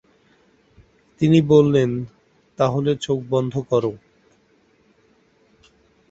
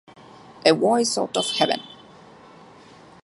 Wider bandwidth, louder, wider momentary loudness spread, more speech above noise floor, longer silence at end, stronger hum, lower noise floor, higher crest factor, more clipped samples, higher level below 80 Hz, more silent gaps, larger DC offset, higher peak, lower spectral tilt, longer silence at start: second, 8 kHz vs 11.5 kHz; about the same, -19 LUFS vs -21 LUFS; first, 11 LU vs 8 LU; first, 41 dB vs 27 dB; first, 2.15 s vs 1.3 s; neither; first, -59 dBFS vs -48 dBFS; about the same, 20 dB vs 22 dB; neither; first, -56 dBFS vs -70 dBFS; neither; neither; about the same, -2 dBFS vs -2 dBFS; first, -7.5 dB/octave vs -3 dB/octave; first, 1.2 s vs 0.65 s